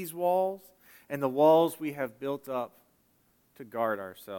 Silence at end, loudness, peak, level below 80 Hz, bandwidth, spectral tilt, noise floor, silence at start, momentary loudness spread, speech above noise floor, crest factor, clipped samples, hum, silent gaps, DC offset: 0 s; -29 LUFS; -12 dBFS; -80 dBFS; 17.5 kHz; -6 dB/octave; -69 dBFS; 0 s; 17 LU; 40 dB; 18 dB; under 0.1%; none; none; under 0.1%